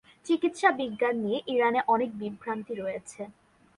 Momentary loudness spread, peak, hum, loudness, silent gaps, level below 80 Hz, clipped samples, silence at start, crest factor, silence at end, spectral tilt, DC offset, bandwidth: 13 LU; -8 dBFS; none; -28 LUFS; none; -70 dBFS; under 0.1%; 0.25 s; 20 dB; 0.45 s; -5 dB/octave; under 0.1%; 11.5 kHz